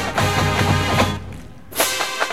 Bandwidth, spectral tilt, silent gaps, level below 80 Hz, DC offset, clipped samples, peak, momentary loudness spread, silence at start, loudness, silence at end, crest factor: 17 kHz; -4 dB/octave; none; -38 dBFS; 1%; under 0.1%; -2 dBFS; 13 LU; 0 s; -19 LUFS; 0 s; 18 dB